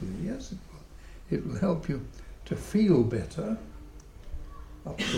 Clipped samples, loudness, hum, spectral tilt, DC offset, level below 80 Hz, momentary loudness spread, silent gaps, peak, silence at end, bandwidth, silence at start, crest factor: under 0.1%; -30 LUFS; none; -6.5 dB/octave; under 0.1%; -46 dBFS; 26 LU; none; -12 dBFS; 0 s; 15.5 kHz; 0 s; 20 dB